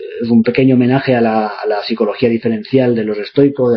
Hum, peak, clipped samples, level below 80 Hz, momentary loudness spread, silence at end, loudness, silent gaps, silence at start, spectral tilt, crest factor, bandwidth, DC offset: none; 0 dBFS; under 0.1%; -52 dBFS; 6 LU; 0 s; -14 LUFS; none; 0 s; -10 dB/octave; 12 dB; 5.6 kHz; under 0.1%